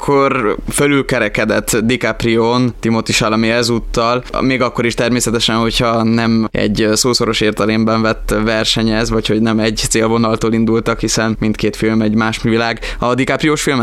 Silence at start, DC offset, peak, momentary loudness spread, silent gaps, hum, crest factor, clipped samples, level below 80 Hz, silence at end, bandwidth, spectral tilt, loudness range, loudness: 0 s; under 0.1%; 0 dBFS; 3 LU; none; none; 14 dB; under 0.1%; -30 dBFS; 0 s; 15.5 kHz; -4.5 dB/octave; 1 LU; -14 LUFS